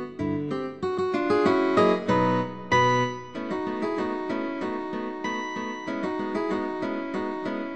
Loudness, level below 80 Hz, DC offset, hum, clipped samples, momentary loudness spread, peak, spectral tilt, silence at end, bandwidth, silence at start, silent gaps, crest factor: -26 LUFS; -60 dBFS; 0.3%; none; under 0.1%; 10 LU; -10 dBFS; -6 dB/octave; 0 s; 9.4 kHz; 0 s; none; 16 dB